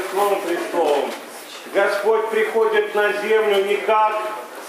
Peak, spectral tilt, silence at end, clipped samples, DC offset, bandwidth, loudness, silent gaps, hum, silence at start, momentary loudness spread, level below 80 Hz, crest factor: -6 dBFS; -3 dB/octave; 0 s; under 0.1%; under 0.1%; 16 kHz; -19 LUFS; none; none; 0 s; 10 LU; -88 dBFS; 14 dB